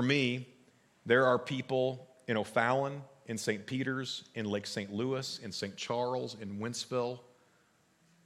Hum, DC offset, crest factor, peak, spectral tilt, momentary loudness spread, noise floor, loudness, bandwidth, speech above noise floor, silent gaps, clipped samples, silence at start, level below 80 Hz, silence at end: none; under 0.1%; 22 dB; -12 dBFS; -5 dB/octave; 11 LU; -69 dBFS; -34 LUFS; 15 kHz; 36 dB; none; under 0.1%; 0 s; -82 dBFS; 1.05 s